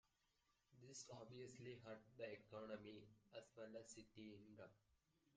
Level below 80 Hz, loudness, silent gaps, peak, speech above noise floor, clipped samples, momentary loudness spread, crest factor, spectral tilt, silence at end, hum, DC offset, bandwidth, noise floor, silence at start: -86 dBFS; -60 LUFS; none; -42 dBFS; 27 dB; under 0.1%; 7 LU; 20 dB; -4.5 dB/octave; 0 s; none; under 0.1%; 9 kHz; -86 dBFS; 0.7 s